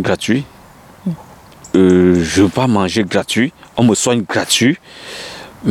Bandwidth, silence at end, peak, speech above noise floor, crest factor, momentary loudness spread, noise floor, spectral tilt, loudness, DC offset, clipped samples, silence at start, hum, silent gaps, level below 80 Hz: 16.5 kHz; 0 s; 0 dBFS; 27 dB; 14 dB; 17 LU; -41 dBFS; -4.5 dB/octave; -14 LUFS; under 0.1%; under 0.1%; 0 s; none; none; -46 dBFS